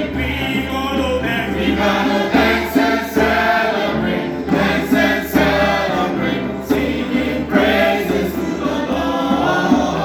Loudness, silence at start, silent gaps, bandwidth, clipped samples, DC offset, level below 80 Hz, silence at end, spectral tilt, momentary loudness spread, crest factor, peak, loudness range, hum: -17 LUFS; 0 s; none; over 20 kHz; under 0.1%; under 0.1%; -36 dBFS; 0 s; -5.5 dB/octave; 5 LU; 16 dB; -2 dBFS; 2 LU; none